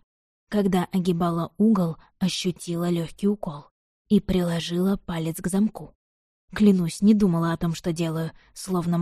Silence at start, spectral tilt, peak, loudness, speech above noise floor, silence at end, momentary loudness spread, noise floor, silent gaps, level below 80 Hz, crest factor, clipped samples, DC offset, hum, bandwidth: 0.5 s; -6.5 dB/octave; -6 dBFS; -24 LUFS; over 67 dB; 0 s; 10 LU; under -90 dBFS; 3.71-4.05 s, 5.95-6.48 s; -48 dBFS; 18 dB; under 0.1%; under 0.1%; none; 14 kHz